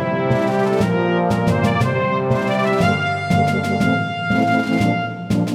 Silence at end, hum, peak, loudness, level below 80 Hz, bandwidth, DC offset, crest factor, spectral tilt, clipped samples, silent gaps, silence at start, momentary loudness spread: 0 s; none; -4 dBFS; -18 LUFS; -44 dBFS; 15.5 kHz; under 0.1%; 14 dB; -7 dB/octave; under 0.1%; none; 0 s; 3 LU